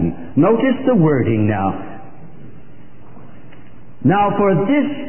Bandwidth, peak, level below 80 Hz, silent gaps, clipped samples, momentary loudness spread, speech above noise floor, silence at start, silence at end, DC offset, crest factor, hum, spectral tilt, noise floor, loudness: 3.2 kHz; -2 dBFS; -44 dBFS; none; under 0.1%; 9 LU; 28 dB; 0 s; 0 s; 4%; 14 dB; none; -13 dB/octave; -43 dBFS; -16 LUFS